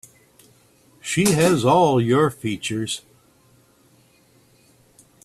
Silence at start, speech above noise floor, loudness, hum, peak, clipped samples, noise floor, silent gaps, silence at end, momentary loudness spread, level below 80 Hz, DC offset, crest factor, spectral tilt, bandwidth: 1.05 s; 38 dB; -19 LUFS; none; -4 dBFS; under 0.1%; -57 dBFS; none; 2.25 s; 12 LU; -56 dBFS; under 0.1%; 20 dB; -5 dB/octave; 14.5 kHz